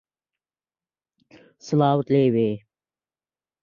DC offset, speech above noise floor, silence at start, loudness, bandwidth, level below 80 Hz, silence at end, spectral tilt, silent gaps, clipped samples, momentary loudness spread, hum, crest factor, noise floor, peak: under 0.1%; over 70 dB; 1.65 s; -21 LUFS; 7.2 kHz; -66 dBFS; 1.05 s; -8 dB/octave; none; under 0.1%; 7 LU; none; 20 dB; under -90 dBFS; -6 dBFS